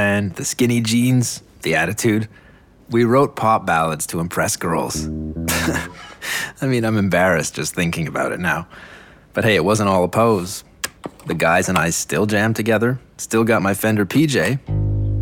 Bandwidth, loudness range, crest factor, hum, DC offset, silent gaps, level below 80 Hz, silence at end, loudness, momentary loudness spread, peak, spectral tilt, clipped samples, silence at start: 19.5 kHz; 2 LU; 18 dB; none; under 0.1%; none; -40 dBFS; 0 s; -19 LUFS; 10 LU; -2 dBFS; -5 dB/octave; under 0.1%; 0 s